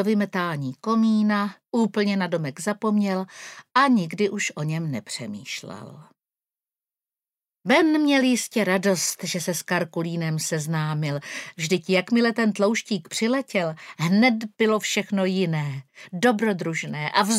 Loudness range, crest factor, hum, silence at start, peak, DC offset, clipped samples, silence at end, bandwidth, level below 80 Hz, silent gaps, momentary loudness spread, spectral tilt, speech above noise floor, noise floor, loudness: 4 LU; 20 dB; none; 0 s; -4 dBFS; under 0.1%; under 0.1%; 0 s; 16 kHz; -76 dBFS; none; 12 LU; -4.5 dB/octave; over 67 dB; under -90 dBFS; -23 LUFS